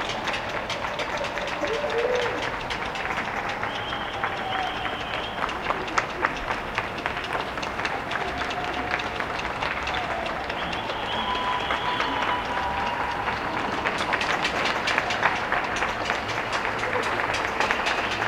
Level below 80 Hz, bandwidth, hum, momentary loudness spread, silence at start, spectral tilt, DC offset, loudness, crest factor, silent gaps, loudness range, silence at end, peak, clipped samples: -46 dBFS; 16.5 kHz; none; 5 LU; 0 s; -3.5 dB/octave; under 0.1%; -26 LUFS; 24 dB; none; 3 LU; 0 s; -4 dBFS; under 0.1%